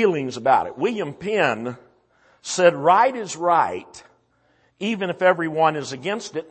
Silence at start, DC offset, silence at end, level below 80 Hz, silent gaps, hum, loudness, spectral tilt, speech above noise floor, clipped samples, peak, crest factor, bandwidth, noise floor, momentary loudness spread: 0 s; under 0.1%; 0.05 s; -66 dBFS; none; none; -21 LUFS; -4.5 dB/octave; 42 dB; under 0.1%; -4 dBFS; 18 dB; 8.8 kHz; -62 dBFS; 12 LU